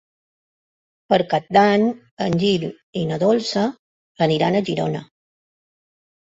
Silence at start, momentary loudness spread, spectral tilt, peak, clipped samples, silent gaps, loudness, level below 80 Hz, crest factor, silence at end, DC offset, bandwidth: 1.1 s; 10 LU; -6 dB/octave; -2 dBFS; under 0.1%; 2.11-2.17 s, 2.83-2.93 s, 3.79-4.15 s; -20 LUFS; -60 dBFS; 20 dB; 1.25 s; under 0.1%; 8 kHz